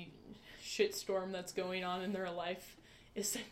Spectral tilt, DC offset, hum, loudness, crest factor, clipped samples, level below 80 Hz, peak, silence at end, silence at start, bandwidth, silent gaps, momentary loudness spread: -3 dB/octave; under 0.1%; none; -40 LUFS; 20 dB; under 0.1%; -70 dBFS; -20 dBFS; 0 s; 0 s; 16 kHz; none; 19 LU